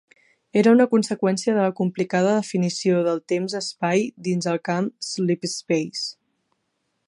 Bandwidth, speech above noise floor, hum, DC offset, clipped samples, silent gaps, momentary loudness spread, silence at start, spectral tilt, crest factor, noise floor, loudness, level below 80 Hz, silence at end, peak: 11.5 kHz; 53 dB; none; under 0.1%; under 0.1%; none; 9 LU; 0.55 s; -5.5 dB/octave; 18 dB; -74 dBFS; -22 LUFS; -72 dBFS; 0.95 s; -4 dBFS